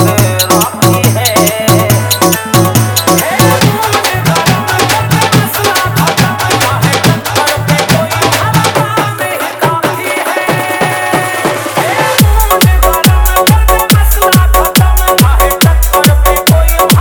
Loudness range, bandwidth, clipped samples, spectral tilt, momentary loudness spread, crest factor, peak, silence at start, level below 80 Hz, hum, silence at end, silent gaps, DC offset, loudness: 4 LU; 20 kHz; 0.4%; -4 dB/octave; 4 LU; 8 dB; 0 dBFS; 0 s; -16 dBFS; none; 0 s; none; under 0.1%; -9 LUFS